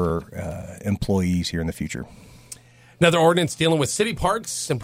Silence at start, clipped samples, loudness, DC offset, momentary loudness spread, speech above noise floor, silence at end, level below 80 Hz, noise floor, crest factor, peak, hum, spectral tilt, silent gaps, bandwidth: 0 s; under 0.1%; -22 LUFS; under 0.1%; 21 LU; 23 dB; 0 s; -42 dBFS; -45 dBFS; 20 dB; -4 dBFS; none; -5 dB/octave; none; 16 kHz